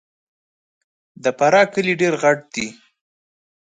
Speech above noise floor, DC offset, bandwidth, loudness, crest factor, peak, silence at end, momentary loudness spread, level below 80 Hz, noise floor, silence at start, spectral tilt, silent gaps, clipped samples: over 73 dB; under 0.1%; 9.4 kHz; -18 LUFS; 20 dB; -2 dBFS; 1.05 s; 13 LU; -66 dBFS; under -90 dBFS; 1.25 s; -4.5 dB/octave; none; under 0.1%